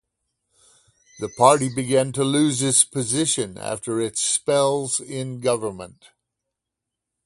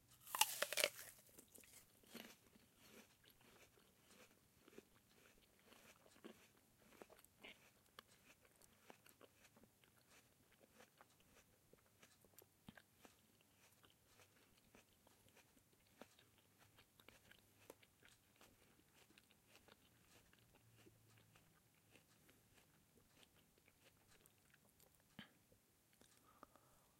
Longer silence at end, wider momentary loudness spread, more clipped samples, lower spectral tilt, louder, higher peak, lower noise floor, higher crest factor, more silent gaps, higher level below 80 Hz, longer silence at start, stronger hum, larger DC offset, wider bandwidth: first, 1.35 s vs 0.15 s; second, 14 LU vs 28 LU; neither; first, -3.5 dB/octave vs -0.5 dB/octave; first, -21 LUFS vs -43 LUFS; first, 0 dBFS vs -16 dBFS; first, -84 dBFS vs -77 dBFS; second, 22 dB vs 42 dB; neither; first, -60 dBFS vs -88 dBFS; first, 1.15 s vs 0.05 s; neither; neither; second, 11.5 kHz vs 16 kHz